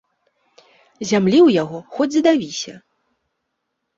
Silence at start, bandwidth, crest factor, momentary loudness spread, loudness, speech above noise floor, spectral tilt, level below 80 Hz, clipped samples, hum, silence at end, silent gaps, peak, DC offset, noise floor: 1 s; 7.8 kHz; 16 dB; 16 LU; -17 LUFS; 59 dB; -5.5 dB/octave; -62 dBFS; under 0.1%; none; 1.2 s; none; -4 dBFS; under 0.1%; -76 dBFS